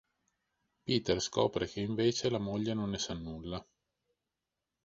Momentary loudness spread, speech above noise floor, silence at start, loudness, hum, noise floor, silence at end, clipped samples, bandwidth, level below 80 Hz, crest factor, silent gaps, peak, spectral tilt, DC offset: 11 LU; 55 dB; 0.85 s; -34 LUFS; none; -89 dBFS; 1.25 s; under 0.1%; 8 kHz; -58 dBFS; 22 dB; none; -14 dBFS; -5 dB/octave; under 0.1%